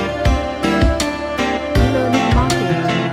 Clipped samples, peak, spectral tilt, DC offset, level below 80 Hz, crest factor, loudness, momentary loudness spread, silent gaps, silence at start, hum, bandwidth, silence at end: under 0.1%; -2 dBFS; -5.5 dB/octave; under 0.1%; -24 dBFS; 14 dB; -17 LUFS; 4 LU; none; 0 s; none; 15.5 kHz; 0 s